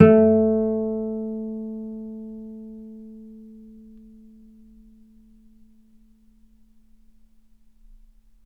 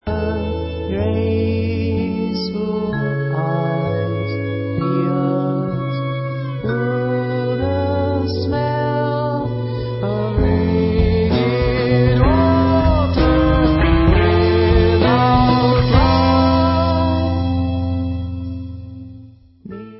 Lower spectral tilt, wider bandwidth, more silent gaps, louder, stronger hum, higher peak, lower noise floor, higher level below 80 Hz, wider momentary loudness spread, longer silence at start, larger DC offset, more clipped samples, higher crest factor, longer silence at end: about the same, -11 dB/octave vs -11.5 dB/octave; second, 3.3 kHz vs 5.8 kHz; neither; second, -23 LUFS vs -17 LUFS; neither; about the same, 0 dBFS vs 0 dBFS; first, -55 dBFS vs -41 dBFS; second, -56 dBFS vs -24 dBFS; first, 28 LU vs 9 LU; about the same, 0 s vs 0.05 s; neither; neither; first, 24 dB vs 16 dB; first, 5 s vs 0 s